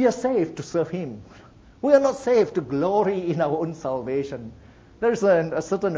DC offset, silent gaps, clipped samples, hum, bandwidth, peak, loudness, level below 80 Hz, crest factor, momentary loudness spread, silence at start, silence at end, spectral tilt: under 0.1%; none; under 0.1%; none; 8 kHz; -4 dBFS; -23 LUFS; -56 dBFS; 18 dB; 13 LU; 0 s; 0 s; -6.5 dB/octave